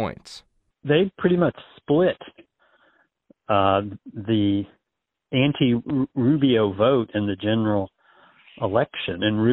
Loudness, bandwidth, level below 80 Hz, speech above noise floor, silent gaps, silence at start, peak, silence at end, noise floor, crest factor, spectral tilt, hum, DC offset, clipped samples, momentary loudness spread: -22 LUFS; 9 kHz; -56 dBFS; 61 dB; none; 0 s; -6 dBFS; 0 s; -82 dBFS; 16 dB; -8 dB/octave; none; under 0.1%; under 0.1%; 16 LU